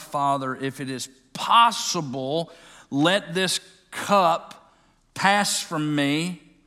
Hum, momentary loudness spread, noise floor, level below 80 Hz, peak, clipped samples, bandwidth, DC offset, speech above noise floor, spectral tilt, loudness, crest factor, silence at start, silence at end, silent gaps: none; 13 LU; -60 dBFS; -66 dBFS; -4 dBFS; under 0.1%; 16 kHz; under 0.1%; 37 dB; -3.5 dB/octave; -23 LUFS; 20 dB; 0 s; 0.3 s; none